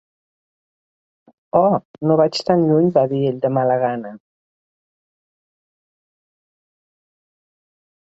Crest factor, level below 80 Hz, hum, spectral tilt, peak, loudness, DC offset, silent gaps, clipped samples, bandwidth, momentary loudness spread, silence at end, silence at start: 20 dB; -62 dBFS; none; -7.5 dB/octave; -2 dBFS; -17 LUFS; under 0.1%; 1.85-1.94 s; under 0.1%; 8 kHz; 6 LU; 3.85 s; 1.55 s